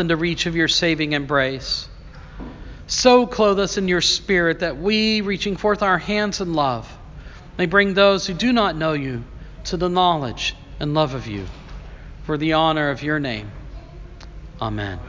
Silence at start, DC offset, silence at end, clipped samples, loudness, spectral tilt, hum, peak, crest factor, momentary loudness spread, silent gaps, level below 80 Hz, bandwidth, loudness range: 0 s; under 0.1%; 0 s; under 0.1%; -20 LUFS; -4.5 dB/octave; none; 0 dBFS; 20 dB; 22 LU; none; -40 dBFS; 7.6 kHz; 5 LU